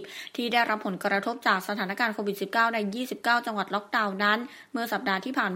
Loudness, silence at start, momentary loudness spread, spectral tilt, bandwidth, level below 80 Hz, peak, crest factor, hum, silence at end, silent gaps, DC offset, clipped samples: -27 LUFS; 0 s; 7 LU; -4.5 dB/octave; 16 kHz; -80 dBFS; -8 dBFS; 20 dB; none; 0 s; none; under 0.1%; under 0.1%